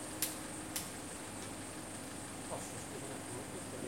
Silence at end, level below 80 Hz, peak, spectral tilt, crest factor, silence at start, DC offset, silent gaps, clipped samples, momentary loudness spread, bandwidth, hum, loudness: 0 s; -66 dBFS; -18 dBFS; -3 dB/octave; 26 dB; 0 s; under 0.1%; none; under 0.1%; 6 LU; 16.5 kHz; none; -43 LUFS